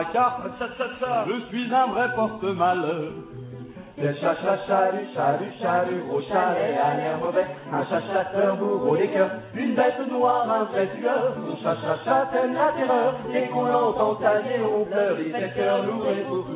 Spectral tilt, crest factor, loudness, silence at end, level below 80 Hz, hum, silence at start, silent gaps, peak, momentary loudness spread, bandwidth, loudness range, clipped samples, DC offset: -10 dB/octave; 16 dB; -24 LUFS; 0 s; -62 dBFS; none; 0 s; none; -8 dBFS; 7 LU; 4 kHz; 3 LU; under 0.1%; under 0.1%